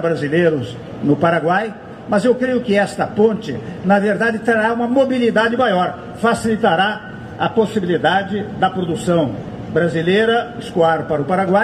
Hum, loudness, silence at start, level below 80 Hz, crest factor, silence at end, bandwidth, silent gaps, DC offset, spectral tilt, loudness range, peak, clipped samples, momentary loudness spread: none; -17 LUFS; 0 s; -50 dBFS; 14 dB; 0 s; 13 kHz; none; under 0.1%; -6 dB/octave; 2 LU; -2 dBFS; under 0.1%; 8 LU